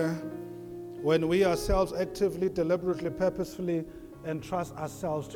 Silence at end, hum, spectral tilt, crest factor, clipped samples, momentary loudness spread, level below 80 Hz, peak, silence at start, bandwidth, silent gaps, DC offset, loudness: 0 s; none; -6.5 dB/octave; 16 dB; under 0.1%; 15 LU; -46 dBFS; -14 dBFS; 0 s; 18.5 kHz; none; under 0.1%; -30 LUFS